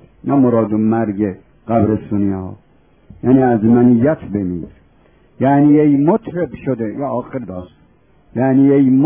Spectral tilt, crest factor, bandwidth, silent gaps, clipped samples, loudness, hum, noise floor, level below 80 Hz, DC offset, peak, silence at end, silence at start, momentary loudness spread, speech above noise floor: -13.5 dB/octave; 14 dB; 3.5 kHz; none; under 0.1%; -15 LUFS; none; -52 dBFS; -44 dBFS; under 0.1%; 0 dBFS; 0 s; 0.25 s; 16 LU; 38 dB